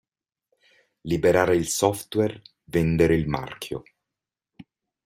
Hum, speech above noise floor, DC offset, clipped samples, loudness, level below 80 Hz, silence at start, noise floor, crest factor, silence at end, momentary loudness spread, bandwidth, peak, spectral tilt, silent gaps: none; 65 dB; under 0.1%; under 0.1%; -23 LUFS; -48 dBFS; 1.05 s; -88 dBFS; 22 dB; 0.45 s; 15 LU; 16 kHz; -4 dBFS; -5.5 dB/octave; none